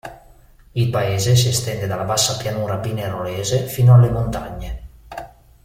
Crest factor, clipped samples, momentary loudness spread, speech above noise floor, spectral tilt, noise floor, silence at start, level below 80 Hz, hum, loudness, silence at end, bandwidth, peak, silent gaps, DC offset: 16 dB; under 0.1%; 22 LU; 30 dB; -5 dB/octave; -47 dBFS; 0.05 s; -38 dBFS; none; -18 LUFS; 0.35 s; 16.5 kHz; -2 dBFS; none; under 0.1%